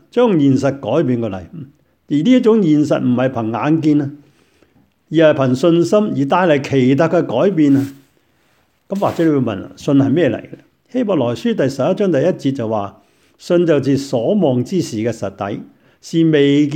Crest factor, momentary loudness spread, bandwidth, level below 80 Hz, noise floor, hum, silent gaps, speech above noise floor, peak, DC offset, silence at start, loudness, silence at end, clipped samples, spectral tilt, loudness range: 14 dB; 11 LU; 9.6 kHz; -58 dBFS; -59 dBFS; none; none; 44 dB; 0 dBFS; under 0.1%; 0.15 s; -15 LUFS; 0 s; under 0.1%; -7 dB/octave; 3 LU